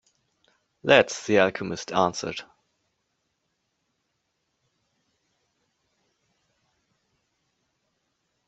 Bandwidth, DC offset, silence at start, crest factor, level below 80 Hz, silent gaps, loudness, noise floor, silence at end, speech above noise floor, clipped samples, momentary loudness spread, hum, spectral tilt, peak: 8.2 kHz; under 0.1%; 0.85 s; 28 dB; -70 dBFS; none; -23 LUFS; -77 dBFS; 6.05 s; 54 dB; under 0.1%; 15 LU; none; -4 dB/octave; -2 dBFS